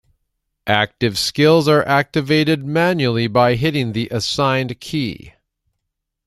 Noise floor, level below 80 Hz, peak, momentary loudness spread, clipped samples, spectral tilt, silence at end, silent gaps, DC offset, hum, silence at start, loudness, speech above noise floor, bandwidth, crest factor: -77 dBFS; -50 dBFS; 0 dBFS; 10 LU; under 0.1%; -5.5 dB/octave; 0.95 s; none; under 0.1%; none; 0.65 s; -17 LUFS; 60 dB; 14.5 kHz; 18 dB